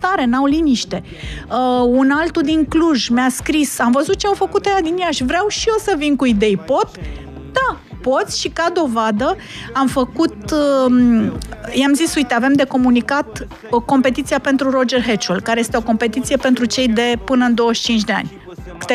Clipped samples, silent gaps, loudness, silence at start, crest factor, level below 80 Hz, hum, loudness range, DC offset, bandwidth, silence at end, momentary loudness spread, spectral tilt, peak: under 0.1%; none; -16 LUFS; 0 s; 14 dB; -38 dBFS; none; 3 LU; under 0.1%; 14.5 kHz; 0 s; 8 LU; -4 dB/octave; -2 dBFS